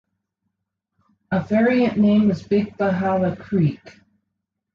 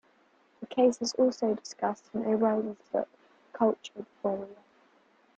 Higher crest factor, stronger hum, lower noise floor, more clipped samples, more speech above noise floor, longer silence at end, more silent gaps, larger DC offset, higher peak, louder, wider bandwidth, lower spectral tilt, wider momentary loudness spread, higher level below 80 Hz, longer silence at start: about the same, 14 dB vs 18 dB; neither; first, -79 dBFS vs -65 dBFS; neither; first, 60 dB vs 36 dB; about the same, 0.85 s vs 0.85 s; neither; neither; first, -8 dBFS vs -12 dBFS; first, -20 LUFS vs -30 LUFS; second, 6.8 kHz vs 9 kHz; first, -9 dB/octave vs -5 dB/octave; second, 7 LU vs 16 LU; first, -54 dBFS vs -74 dBFS; first, 1.3 s vs 0.6 s